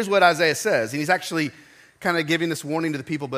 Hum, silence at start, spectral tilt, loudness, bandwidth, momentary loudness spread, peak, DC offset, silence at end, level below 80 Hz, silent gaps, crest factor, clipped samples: none; 0 s; -4 dB/octave; -22 LUFS; 15.5 kHz; 10 LU; -2 dBFS; under 0.1%; 0 s; -70 dBFS; none; 20 dB; under 0.1%